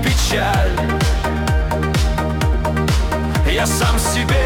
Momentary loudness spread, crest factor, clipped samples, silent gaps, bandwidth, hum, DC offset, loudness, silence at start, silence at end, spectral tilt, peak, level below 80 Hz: 3 LU; 10 dB; under 0.1%; none; 18 kHz; none; under 0.1%; -17 LUFS; 0 s; 0 s; -4.5 dB/octave; -6 dBFS; -20 dBFS